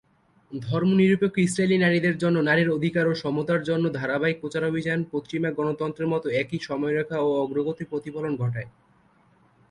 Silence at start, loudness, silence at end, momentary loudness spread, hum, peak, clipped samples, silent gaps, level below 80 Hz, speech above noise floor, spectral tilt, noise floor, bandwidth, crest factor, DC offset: 0.5 s; -24 LUFS; 1 s; 9 LU; none; -10 dBFS; under 0.1%; none; -62 dBFS; 36 dB; -6.5 dB/octave; -60 dBFS; 11.5 kHz; 16 dB; under 0.1%